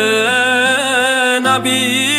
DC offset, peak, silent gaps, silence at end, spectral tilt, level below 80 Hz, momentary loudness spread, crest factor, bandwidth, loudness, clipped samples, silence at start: under 0.1%; -2 dBFS; none; 0 s; -2 dB/octave; -68 dBFS; 1 LU; 12 dB; 16 kHz; -12 LUFS; under 0.1%; 0 s